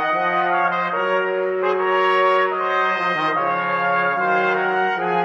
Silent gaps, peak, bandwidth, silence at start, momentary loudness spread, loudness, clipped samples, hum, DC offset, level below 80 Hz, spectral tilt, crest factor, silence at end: none; -6 dBFS; 7.4 kHz; 0 s; 3 LU; -19 LUFS; under 0.1%; none; under 0.1%; -76 dBFS; -6 dB/octave; 12 dB; 0 s